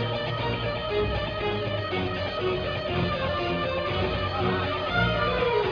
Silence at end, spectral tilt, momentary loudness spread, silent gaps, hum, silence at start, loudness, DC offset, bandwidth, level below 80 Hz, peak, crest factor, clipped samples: 0 s; -7 dB/octave; 4 LU; none; none; 0 s; -27 LUFS; under 0.1%; 5.4 kHz; -42 dBFS; -10 dBFS; 16 dB; under 0.1%